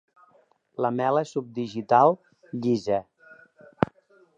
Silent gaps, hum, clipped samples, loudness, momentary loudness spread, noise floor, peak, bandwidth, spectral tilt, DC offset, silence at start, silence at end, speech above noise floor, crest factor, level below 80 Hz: none; none; under 0.1%; -25 LUFS; 13 LU; -62 dBFS; -2 dBFS; 8.2 kHz; -7 dB/octave; under 0.1%; 0.8 s; 0.5 s; 39 dB; 26 dB; -62 dBFS